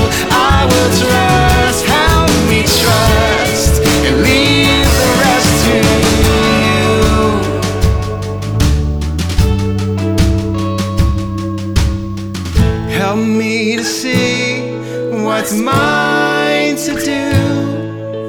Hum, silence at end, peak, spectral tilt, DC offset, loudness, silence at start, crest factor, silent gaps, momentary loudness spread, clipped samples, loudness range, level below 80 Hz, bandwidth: none; 0 s; 0 dBFS; -4.5 dB/octave; under 0.1%; -12 LUFS; 0 s; 12 dB; none; 8 LU; under 0.1%; 5 LU; -20 dBFS; over 20 kHz